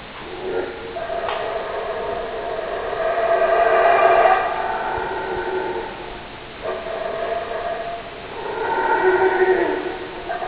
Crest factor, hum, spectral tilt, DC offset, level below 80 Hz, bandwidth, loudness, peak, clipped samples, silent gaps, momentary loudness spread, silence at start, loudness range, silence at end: 20 dB; none; -9 dB/octave; under 0.1%; -46 dBFS; 4.9 kHz; -21 LUFS; -2 dBFS; under 0.1%; none; 15 LU; 0 s; 8 LU; 0 s